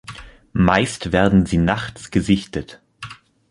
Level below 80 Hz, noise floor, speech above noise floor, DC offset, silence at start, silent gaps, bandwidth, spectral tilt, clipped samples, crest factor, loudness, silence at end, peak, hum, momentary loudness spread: -36 dBFS; -39 dBFS; 21 dB; under 0.1%; 0.1 s; none; 11.5 kHz; -6 dB/octave; under 0.1%; 20 dB; -19 LUFS; 0.35 s; 0 dBFS; none; 21 LU